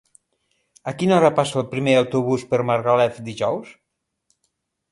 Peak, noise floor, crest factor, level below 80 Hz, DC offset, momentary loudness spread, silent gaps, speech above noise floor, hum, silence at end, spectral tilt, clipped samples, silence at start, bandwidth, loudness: -2 dBFS; -73 dBFS; 20 dB; -62 dBFS; under 0.1%; 9 LU; none; 54 dB; none; 1.2 s; -6 dB/octave; under 0.1%; 0.85 s; 11.5 kHz; -20 LUFS